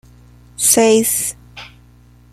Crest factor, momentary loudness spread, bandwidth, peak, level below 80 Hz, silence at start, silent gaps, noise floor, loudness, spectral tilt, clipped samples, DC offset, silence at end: 18 dB; 25 LU; 15.5 kHz; 0 dBFS; -48 dBFS; 0.6 s; none; -46 dBFS; -13 LUFS; -2.5 dB/octave; under 0.1%; under 0.1%; 0.65 s